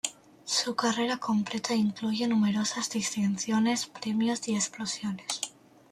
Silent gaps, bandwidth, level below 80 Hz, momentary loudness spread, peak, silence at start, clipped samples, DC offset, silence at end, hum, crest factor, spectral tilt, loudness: none; 14.5 kHz; -72 dBFS; 7 LU; -12 dBFS; 0.05 s; under 0.1%; under 0.1%; 0.4 s; none; 18 dB; -3.5 dB/octave; -29 LUFS